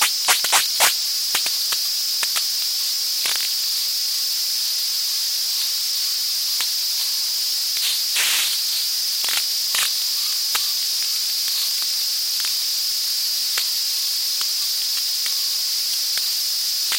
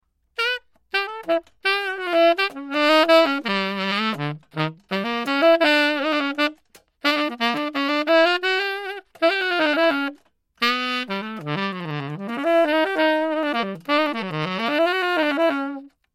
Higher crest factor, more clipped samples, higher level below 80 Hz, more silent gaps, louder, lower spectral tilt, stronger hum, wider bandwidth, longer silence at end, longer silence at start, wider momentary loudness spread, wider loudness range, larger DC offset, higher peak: about the same, 22 dB vs 18 dB; neither; about the same, -74 dBFS vs -70 dBFS; neither; first, -18 LUFS vs -21 LUFS; second, 4.5 dB/octave vs -5 dB/octave; neither; first, 17 kHz vs 14.5 kHz; second, 0 s vs 0.25 s; second, 0 s vs 0.4 s; second, 3 LU vs 11 LU; about the same, 1 LU vs 3 LU; neither; about the same, 0 dBFS vs -2 dBFS